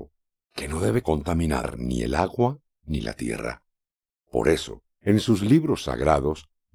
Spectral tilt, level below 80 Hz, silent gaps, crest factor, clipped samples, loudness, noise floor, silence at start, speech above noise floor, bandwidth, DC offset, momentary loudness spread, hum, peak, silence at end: -6.5 dB/octave; -38 dBFS; none; 22 dB; under 0.1%; -25 LUFS; -90 dBFS; 0 s; 67 dB; over 20 kHz; under 0.1%; 14 LU; none; -4 dBFS; 0.3 s